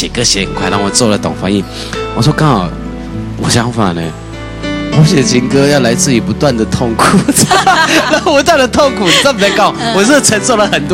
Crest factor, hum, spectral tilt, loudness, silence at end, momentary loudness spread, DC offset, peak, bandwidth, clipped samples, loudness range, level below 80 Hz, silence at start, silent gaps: 10 dB; none; -4 dB/octave; -10 LUFS; 0 s; 12 LU; under 0.1%; 0 dBFS; 16.5 kHz; under 0.1%; 5 LU; -30 dBFS; 0 s; none